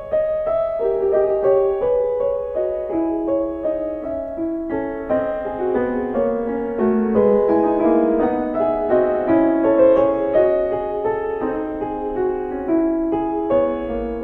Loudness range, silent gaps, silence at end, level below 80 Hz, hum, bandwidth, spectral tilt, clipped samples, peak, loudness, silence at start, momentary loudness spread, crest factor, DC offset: 6 LU; none; 0 s; -44 dBFS; none; 4 kHz; -10 dB/octave; under 0.1%; -4 dBFS; -19 LUFS; 0 s; 8 LU; 16 dB; under 0.1%